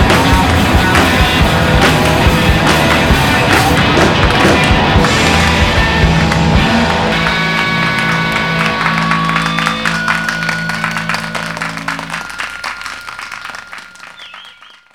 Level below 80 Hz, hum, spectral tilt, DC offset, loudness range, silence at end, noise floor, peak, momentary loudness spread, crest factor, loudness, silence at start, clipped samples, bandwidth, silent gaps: -22 dBFS; none; -4.5 dB/octave; 0.6%; 10 LU; 0.45 s; -39 dBFS; 0 dBFS; 14 LU; 12 dB; -11 LUFS; 0 s; 0.1%; 19 kHz; none